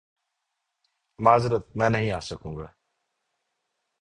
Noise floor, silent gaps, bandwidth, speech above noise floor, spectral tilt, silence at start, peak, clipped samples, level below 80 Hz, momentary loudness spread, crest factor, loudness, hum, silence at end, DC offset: -81 dBFS; none; 10.5 kHz; 57 dB; -6.5 dB/octave; 1.2 s; -4 dBFS; under 0.1%; -52 dBFS; 18 LU; 24 dB; -24 LUFS; none; 1.35 s; under 0.1%